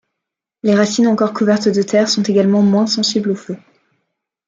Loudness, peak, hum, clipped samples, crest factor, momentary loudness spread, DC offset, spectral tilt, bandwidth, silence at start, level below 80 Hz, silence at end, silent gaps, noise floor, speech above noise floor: -15 LUFS; -2 dBFS; none; under 0.1%; 14 dB; 9 LU; under 0.1%; -5 dB/octave; 7.6 kHz; 0.65 s; -62 dBFS; 0.9 s; none; -81 dBFS; 67 dB